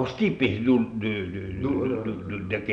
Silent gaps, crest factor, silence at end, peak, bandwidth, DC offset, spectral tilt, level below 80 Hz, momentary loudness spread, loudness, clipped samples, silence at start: none; 18 dB; 0 s; -8 dBFS; 6.6 kHz; under 0.1%; -8 dB/octave; -50 dBFS; 9 LU; -26 LUFS; under 0.1%; 0 s